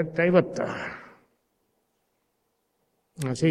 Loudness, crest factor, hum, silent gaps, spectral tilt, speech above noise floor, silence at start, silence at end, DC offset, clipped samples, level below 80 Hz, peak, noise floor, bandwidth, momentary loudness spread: -25 LUFS; 24 dB; none; none; -6.5 dB/octave; 50 dB; 0 s; 0 s; under 0.1%; under 0.1%; -66 dBFS; -6 dBFS; -75 dBFS; 13.5 kHz; 15 LU